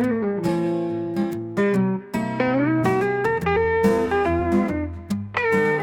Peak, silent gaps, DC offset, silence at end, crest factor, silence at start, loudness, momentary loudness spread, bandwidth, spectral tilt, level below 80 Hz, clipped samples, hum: -6 dBFS; none; under 0.1%; 0 s; 16 dB; 0 s; -22 LUFS; 6 LU; 18 kHz; -7.5 dB/octave; -48 dBFS; under 0.1%; none